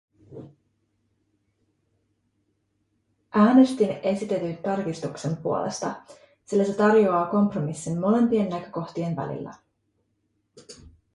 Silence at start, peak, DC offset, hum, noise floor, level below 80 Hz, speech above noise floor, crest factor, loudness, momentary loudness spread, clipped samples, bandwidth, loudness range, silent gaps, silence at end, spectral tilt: 0.3 s; -6 dBFS; under 0.1%; none; -73 dBFS; -64 dBFS; 50 dB; 20 dB; -24 LUFS; 15 LU; under 0.1%; 11.5 kHz; 4 LU; none; 0.25 s; -7 dB/octave